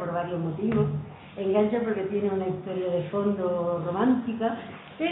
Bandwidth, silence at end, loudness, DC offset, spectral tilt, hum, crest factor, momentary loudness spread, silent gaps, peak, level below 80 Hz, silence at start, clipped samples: 4 kHz; 0 s; -27 LUFS; under 0.1%; -11.5 dB/octave; none; 16 dB; 7 LU; none; -12 dBFS; -60 dBFS; 0 s; under 0.1%